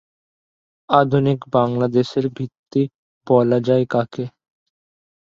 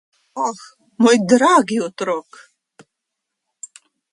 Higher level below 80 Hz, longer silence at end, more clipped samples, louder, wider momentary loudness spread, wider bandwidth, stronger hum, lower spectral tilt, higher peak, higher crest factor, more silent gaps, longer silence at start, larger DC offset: first, -60 dBFS vs -68 dBFS; second, 0.9 s vs 1.9 s; neither; about the same, -19 LUFS vs -17 LUFS; second, 11 LU vs 25 LU; second, 7.6 kHz vs 11.5 kHz; neither; first, -8.5 dB/octave vs -4 dB/octave; about the same, 0 dBFS vs 0 dBFS; about the same, 20 dB vs 18 dB; first, 2.59-2.64 s, 2.94-3.21 s vs none; first, 0.9 s vs 0.35 s; neither